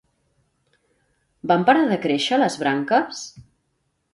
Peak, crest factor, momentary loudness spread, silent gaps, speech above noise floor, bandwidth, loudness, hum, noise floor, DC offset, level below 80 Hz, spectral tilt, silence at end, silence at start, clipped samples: -4 dBFS; 20 dB; 17 LU; none; 52 dB; 11.5 kHz; -20 LUFS; none; -71 dBFS; under 0.1%; -66 dBFS; -4.5 dB/octave; 0.75 s; 1.45 s; under 0.1%